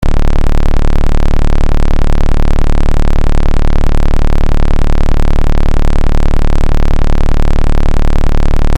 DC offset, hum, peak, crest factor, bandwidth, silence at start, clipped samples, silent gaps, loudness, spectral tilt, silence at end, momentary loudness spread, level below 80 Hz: under 0.1%; none; -2 dBFS; 4 dB; 6.2 kHz; 0 s; under 0.1%; none; -15 LUFS; -7 dB/octave; 0 s; 0 LU; -8 dBFS